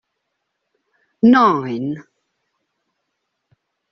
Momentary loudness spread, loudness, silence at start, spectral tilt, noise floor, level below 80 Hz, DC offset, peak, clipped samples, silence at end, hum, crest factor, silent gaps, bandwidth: 15 LU; -16 LUFS; 1.25 s; -5 dB/octave; -75 dBFS; -64 dBFS; under 0.1%; -2 dBFS; under 0.1%; 1.9 s; none; 18 dB; none; 6.2 kHz